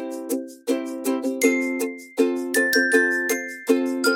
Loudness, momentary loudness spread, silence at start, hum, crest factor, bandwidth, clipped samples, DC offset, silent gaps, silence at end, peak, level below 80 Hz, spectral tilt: -22 LUFS; 10 LU; 0 s; none; 18 dB; 17 kHz; under 0.1%; under 0.1%; none; 0 s; -4 dBFS; -76 dBFS; -1.5 dB/octave